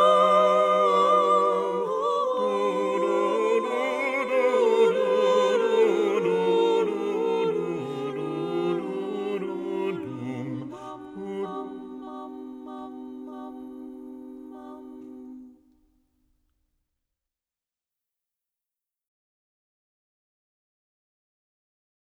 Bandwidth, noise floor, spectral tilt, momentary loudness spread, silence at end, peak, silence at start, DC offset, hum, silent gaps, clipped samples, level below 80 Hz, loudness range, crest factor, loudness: 10.5 kHz; under -90 dBFS; -5.5 dB/octave; 21 LU; 6.55 s; -8 dBFS; 0 s; under 0.1%; none; none; under 0.1%; -72 dBFS; 19 LU; 18 dB; -24 LUFS